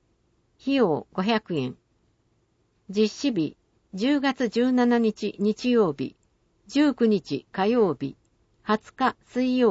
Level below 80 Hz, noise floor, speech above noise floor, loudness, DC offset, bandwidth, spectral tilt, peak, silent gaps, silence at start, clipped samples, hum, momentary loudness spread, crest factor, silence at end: -64 dBFS; -68 dBFS; 45 dB; -25 LUFS; under 0.1%; 8 kHz; -6 dB/octave; -8 dBFS; none; 0.65 s; under 0.1%; none; 11 LU; 16 dB; 0 s